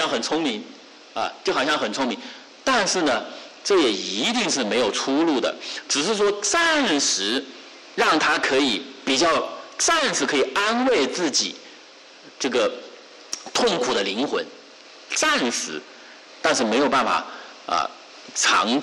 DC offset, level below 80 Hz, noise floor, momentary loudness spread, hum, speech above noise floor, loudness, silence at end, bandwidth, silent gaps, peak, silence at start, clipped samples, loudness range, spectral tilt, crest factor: under 0.1%; -62 dBFS; -46 dBFS; 14 LU; none; 25 dB; -21 LUFS; 0 s; 12.5 kHz; none; -10 dBFS; 0 s; under 0.1%; 4 LU; -1.5 dB/octave; 12 dB